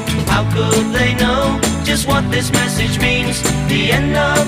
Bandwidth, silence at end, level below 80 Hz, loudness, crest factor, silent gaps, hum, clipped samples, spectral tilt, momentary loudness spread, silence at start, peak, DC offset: 16 kHz; 0 s; -28 dBFS; -15 LUFS; 14 dB; none; none; under 0.1%; -4.5 dB/octave; 2 LU; 0 s; 0 dBFS; under 0.1%